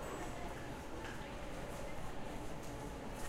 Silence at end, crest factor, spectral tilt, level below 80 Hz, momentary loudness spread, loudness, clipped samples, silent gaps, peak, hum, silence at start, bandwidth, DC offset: 0 s; 12 dB; -5 dB/octave; -52 dBFS; 2 LU; -47 LUFS; under 0.1%; none; -32 dBFS; none; 0 s; 16 kHz; under 0.1%